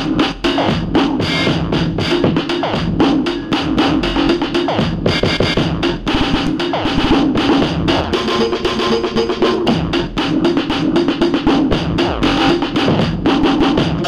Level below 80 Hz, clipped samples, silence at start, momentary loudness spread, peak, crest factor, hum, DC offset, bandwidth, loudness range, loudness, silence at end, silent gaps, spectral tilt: -30 dBFS; under 0.1%; 0 s; 3 LU; 0 dBFS; 14 dB; none; under 0.1%; 11.5 kHz; 1 LU; -15 LUFS; 0 s; none; -6 dB/octave